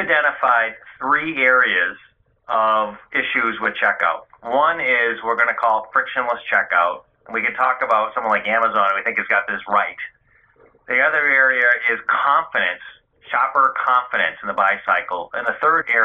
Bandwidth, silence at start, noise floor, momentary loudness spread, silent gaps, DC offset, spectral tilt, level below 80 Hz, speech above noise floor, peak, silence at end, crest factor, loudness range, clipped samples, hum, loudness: 7.8 kHz; 0 s; -55 dBFS; 8 LU; none; under 0.1%; -5 dB/octave; -64 dBFS; 36 dB; -2 dBFS; 0 s; 16 dB; 2 LU; under 0.1%; none; -18 LUFS